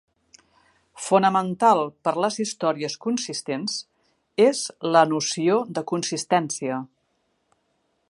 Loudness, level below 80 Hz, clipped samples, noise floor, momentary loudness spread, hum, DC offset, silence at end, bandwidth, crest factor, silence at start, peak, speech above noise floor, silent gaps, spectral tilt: -23 LUFS; -74 dBFS; under 0.1%; -71 dBFS; 10 LU; none; under 0.1%; 1.25 s; 11.5 kHz; 22 dB; 0.95 s; -2 dBFS; 49 dB; none; -4 dB/octave